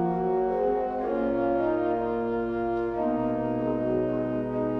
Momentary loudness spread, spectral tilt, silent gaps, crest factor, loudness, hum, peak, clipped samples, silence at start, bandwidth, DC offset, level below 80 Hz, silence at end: 3 LU; -10 dB/octave; none; 12 dB; -27 LUFS; 50 Hz at -50 dBFS; -14 dBFS; under 0.1%; 0 s; 5.6 kHz; under 0.1%; -50 dBFS; 0 s